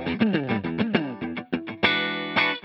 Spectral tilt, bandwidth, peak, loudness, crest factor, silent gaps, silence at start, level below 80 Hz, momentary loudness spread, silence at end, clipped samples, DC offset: -7 dB/octave; 6 kHz; -6 dBFS; -25 LUFS; 20 dB; none; 0 s; -60 dBFS; 9 LU; 0.05 s; under 0.1%; under 0.1%